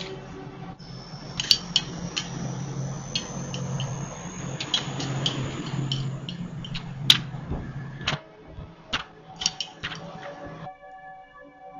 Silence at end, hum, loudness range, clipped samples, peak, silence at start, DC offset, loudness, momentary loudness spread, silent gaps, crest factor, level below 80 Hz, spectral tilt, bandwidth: 0 s; none; 7 LU; under 0.1%; 0 dBFS; 0 s; under 0.1%; -28 LUFS; 21 LU; none; 30 dB; -50 dBFS; -3.5 dB/octave; 9 kHz